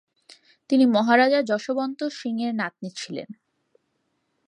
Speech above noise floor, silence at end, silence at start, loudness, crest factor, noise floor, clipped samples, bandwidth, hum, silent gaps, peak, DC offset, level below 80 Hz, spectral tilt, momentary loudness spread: 51 dB; 1.15 s; 0.7 s; -23 LUFS; 20 dB; -73 dBFS; under 0.1%; 10.5 kHz; none; none; -4 dBFS; under 0.1%; -78 dBFS; -5 dB/octave; 16 LU